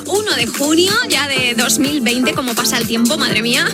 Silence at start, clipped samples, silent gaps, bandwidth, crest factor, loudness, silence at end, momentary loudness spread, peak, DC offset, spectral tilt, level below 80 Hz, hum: 0 s; under 0.1%; none; 18 kHz; 14 dB; -14 LUFS; 0 s; 3 LU; 0 dBFS; under 0.1%; -2.5 dB/octave; -48 dBFS; none